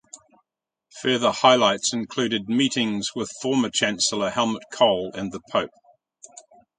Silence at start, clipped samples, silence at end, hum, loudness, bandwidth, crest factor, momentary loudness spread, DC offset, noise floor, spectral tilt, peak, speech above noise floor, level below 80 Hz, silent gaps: 0.15 s; under 0.1%; 0.4 s; none; -22 LUFS; 9.6 kHz; 22 dB; 11 LU; under 0.1%; -83 dBFS; -3 dB/octave; -2 dBFS; 61 dB; -62 dBFS; none